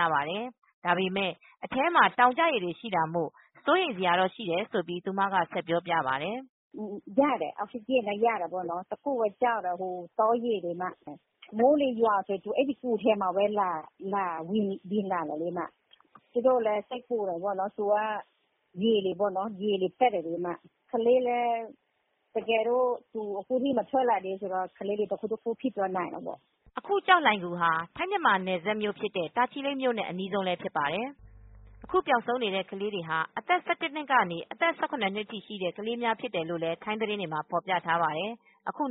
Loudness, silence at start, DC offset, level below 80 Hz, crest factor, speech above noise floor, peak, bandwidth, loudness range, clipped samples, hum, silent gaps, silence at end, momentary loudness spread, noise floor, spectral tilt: -29 LUFS; 0 s; under 0.1%; -68 dBFS; 22 dB; 46 dB; -8 dBFS; 4 kHz; 4 LU; under 0.1%; none; 0.58-0.62 s, 0.74-0.82 s, 6.49-6.71 s; 0 s; 10 LU; -75 dBFS; -2.5 dB/octave